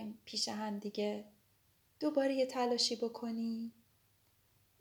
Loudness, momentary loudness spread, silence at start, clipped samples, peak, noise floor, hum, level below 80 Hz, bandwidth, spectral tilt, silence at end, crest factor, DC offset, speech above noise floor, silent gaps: -37 LUFS; 9 LU; 0 s; under 0.1%; -20 dBFS; -72 dBFS; none; -82 dBFS; over 20 kHz; -3.5 dB/octave; 1.1 s; 18 dB; under 0.1%; 36 dB; none